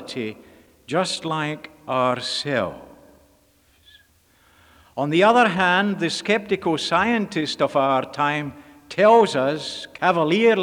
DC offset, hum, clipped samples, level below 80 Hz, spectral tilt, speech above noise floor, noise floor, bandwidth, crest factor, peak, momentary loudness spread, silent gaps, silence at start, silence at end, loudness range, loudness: under 0.1%; none; under 0.1%; -62 dBFS; -4.5 dB/octave; 38 dB; -59 dBFS; 17.5 kHz; 18 dB; -4 dBFS; 15 LU; none; 0 s; 0 s; 8 LU; -21 LUFS